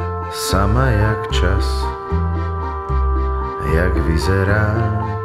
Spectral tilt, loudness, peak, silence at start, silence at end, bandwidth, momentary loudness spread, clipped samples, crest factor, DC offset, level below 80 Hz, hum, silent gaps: -6 dB/octave; -18 LUFS; -2 dBFS; 0 s; 0 s; 14.5 kHz; 6 LU; under 0.1%; 14 dB; under 0.1%; -22 dBFS; none; none